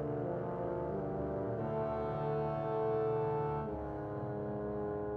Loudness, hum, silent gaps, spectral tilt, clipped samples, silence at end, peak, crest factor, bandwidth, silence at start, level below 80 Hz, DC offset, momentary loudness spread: -37 LUFS; none; none; -10.5 dB/octave; under 0.1%; 0 s; -26 dBFS; 10 dB; 4.8 kHz; 0 s; -56 dBFS; under 0.1%; 6 LU